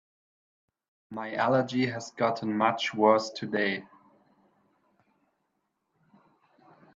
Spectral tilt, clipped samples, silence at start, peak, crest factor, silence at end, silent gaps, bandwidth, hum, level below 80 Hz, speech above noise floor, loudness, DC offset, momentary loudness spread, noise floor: -5.5 dB/octave; under 0.1%; 1.1 s; -8 dBFS; 24 dB; 3.1 s; none; 7.8 kHz; none; -76 dBFS; 52 dB; -28 LUFS; under 0.1%; 12 LU; -79 dBFS